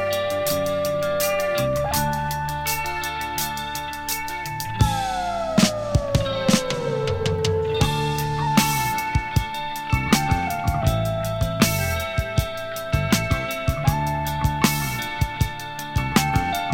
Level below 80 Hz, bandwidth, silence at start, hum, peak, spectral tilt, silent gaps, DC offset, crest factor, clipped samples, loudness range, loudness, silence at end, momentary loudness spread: -34 dBFS; 19 kHz; 0 s; none; 0 dBFS; -4.5 dB/octave; none; under 0.1%; 22 dB; under 0.1%; 2 LU; -23 LUFS; 0 s; 6 LU